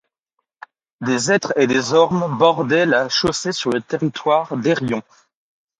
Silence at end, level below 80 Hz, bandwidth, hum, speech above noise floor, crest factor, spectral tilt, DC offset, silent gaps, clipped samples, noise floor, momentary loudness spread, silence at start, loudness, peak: 0.8 s; -56 dBFS; 10.5 kHz; none; 58 dB; 18 dB; -4.5 dB/octave; under 0.1%; none; under 0.1%; -76 dBFS; 7 LU; 1 s; -18 LUFS; 0 dBFS